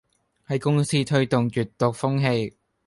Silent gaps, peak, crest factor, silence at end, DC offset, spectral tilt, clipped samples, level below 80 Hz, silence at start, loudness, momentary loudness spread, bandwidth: none; -6 dBFS; 18 dB; 0.4 s; under 0.1%; -6 dB/octave; under 0.1%; -58 dBFS; 0.5 s; -23 LUFS; 5 LU; 11.5 kHz